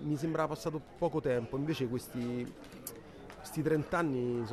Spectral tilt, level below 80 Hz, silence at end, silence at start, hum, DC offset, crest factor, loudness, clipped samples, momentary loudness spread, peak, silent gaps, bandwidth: -6.5 dB/octave; -60 dBFS; 0 s; 0 s; none; under 0.1%; 16 dB; -35 LUFS; under 0.1%; 14 LU; -18 dBFS; none; 14 kHz